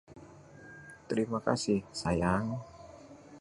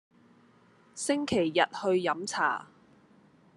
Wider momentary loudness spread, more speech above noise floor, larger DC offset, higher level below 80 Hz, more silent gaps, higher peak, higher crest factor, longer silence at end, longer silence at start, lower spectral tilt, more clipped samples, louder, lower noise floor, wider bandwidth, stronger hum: first, 23 LU vs 9 LU; second, 21 dB vs 33 dB; neither; first, -54 dBFS vs -70 dBFS; neither; second, -12 dBFS vs -8 dBFS; about the same, 24 dB vs 22 dB; second, 0 s vs 0.95 s; second, 0.1 s vs 0.95 s; first, -5.5 dB/octave vs -3.5 dB/octave; neither; second, -32 LUFS vs -29 LUFS; second, -53 dBFS vs -61 dBFS; about the same, 11.5 kHz vs 12.5 kHz; neither